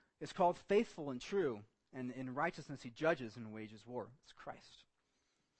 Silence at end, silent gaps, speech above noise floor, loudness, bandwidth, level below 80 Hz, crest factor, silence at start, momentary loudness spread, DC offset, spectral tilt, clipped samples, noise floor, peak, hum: 0.8 s; none; 42 dB; -40 LUFS; 8.4 kHz; -74 dBFS; 20 dB; 0.2 s; 17 LU; under 0.1%; -6 dB/octave; under 0.1%; -82 dBFS; -22 dBFS; none